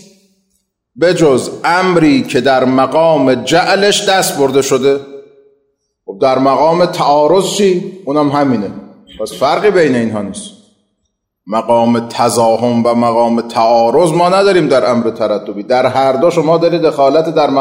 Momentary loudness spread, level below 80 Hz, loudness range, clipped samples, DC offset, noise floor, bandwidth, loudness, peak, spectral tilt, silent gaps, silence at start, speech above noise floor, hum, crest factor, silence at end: 8 LU; -52 dBFS; 4 LU; under 0.1%; under 0.1%; -68 dBFS; 16 kHz; -11 LUFS; 0 dBFS; -5 dB/octave; none; 0.95 s; 57 dB; none; 10 dB; 0 s